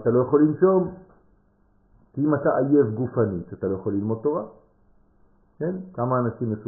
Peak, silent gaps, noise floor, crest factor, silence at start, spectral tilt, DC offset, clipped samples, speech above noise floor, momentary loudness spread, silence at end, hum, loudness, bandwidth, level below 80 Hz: -6 dBFS; none; -61 dBFS; 18 dB; 0 s; -15.5 dB/octave; under 0.1%; under 0.1%; 39 dB; 11 LU; 0 s; none; -23 LUFS; 1.9 kHz; -56 dBFS